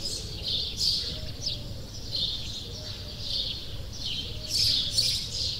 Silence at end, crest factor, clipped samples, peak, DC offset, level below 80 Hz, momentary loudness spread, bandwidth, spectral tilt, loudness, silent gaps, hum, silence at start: 0 s; 18 dB; under 0.1%; -12 dBFS; under 0.1%; -44 dBFS; 13 LU; 16 kHz; -2 dB/octave; -28 LUFS; none; none; 0 s